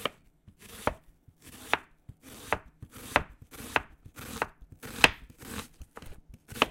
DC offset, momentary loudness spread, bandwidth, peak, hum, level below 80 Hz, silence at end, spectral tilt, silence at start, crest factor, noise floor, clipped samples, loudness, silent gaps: under 0.1%; 26 LU; 16.5 kHz; 0 dBFS; none; -52 dBFS; 0 s; -2.5 dB/octave; 0 s; 34 dB; -59 dBFS; under 0.1%; -31 LUFS; none